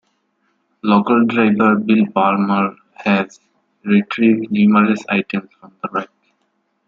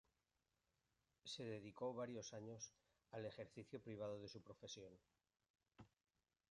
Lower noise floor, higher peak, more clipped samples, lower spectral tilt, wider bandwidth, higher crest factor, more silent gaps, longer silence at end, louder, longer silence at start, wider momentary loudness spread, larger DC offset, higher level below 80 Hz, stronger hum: second, -67 dBFS vs under -90 dBFS; first, -2 dBFS vs -36 dBFS; neither; first, -7.5 dB/octave vs -4.5 dB/octave; second, 7.2 kHz vs 10.5 kHz; about the same, 16 dB vs 20 dB; second, none vs 5.50-5.54 s; first, 0.8 s vs 0.65 s; first, -16 LUFS vs -54 LUFS; second, 0.85 s vs 1.25 s; first, 12 LU vs 8 LU; neither; first, -62 dBFS vs -84 dBFS; neither